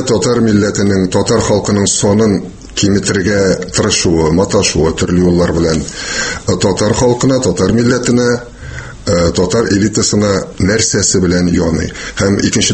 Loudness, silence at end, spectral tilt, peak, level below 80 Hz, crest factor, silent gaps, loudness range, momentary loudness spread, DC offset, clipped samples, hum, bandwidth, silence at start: -12 LUFS; 0 s; -4.5 dB/octave; 0 dBFS; -32 dBFS; 12 dB; none; 1 LU; 5 LU; under 0.1%; under 0.1%; none; 8.8 kHz; 0 s